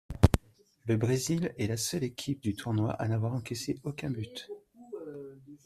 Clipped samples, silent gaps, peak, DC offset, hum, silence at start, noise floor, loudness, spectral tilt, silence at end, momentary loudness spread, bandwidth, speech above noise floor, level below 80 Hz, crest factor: under 0.1%; none; -2 dBFS; under 0.1%; none; 0.1 s; -60 dBFS; -32 LUFS; -5.5 dB/octave; 0.1 s; 17 LU; 14.5 kHz; 28 dB; -44 dBFS; 28 dB